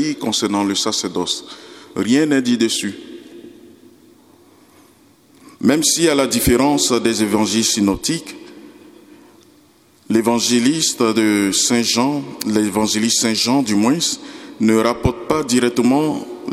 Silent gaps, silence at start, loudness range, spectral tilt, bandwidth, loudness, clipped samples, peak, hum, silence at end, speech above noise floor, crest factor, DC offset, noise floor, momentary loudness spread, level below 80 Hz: none; 0 s; 5 LU; -3.5 dB/octave; 16.5 kHz; -16 LUFS; under 0.1%; 0 dBFS; none; 0 s; 35 dB; 18 dB; under 0.1%; -52 dBFS; 10 LU; -44 dBFS